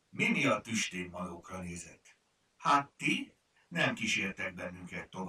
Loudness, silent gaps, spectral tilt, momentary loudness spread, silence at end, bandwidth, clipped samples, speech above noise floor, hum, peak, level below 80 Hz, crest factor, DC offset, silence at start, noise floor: -33 LUFS; none; -3.5 dB/octave; 14 LU; 0 s; 15.5 kHz; under 0.1%; 26 dB; none; -14 dBFS; -68 dBFS; 22 dB; under 0.1%; 0.15 s; -60 dBFS